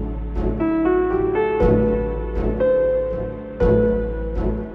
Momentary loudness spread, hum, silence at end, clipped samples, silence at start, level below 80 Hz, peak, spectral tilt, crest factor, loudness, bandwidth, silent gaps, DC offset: 8 LU; none; 0 s; under 0.1%; 0 s; -28 dBFS; -6 dBFS; -10.5 dB/octave; 14 dB; -20 LUFS; 4.7 kHz; none; under 0.1%